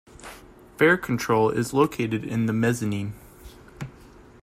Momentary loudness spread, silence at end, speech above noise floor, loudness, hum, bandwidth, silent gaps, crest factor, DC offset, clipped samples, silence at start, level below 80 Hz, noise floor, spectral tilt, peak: 22 LU; 0.55 s; 26 dB; -23 LUFS; none; 16 kHz; none; 18 dB; under 0.1%; under 0.1%; 0.2 s; -54 dBFS; -49 dBFS; -6 dB/octave; -6 dBFS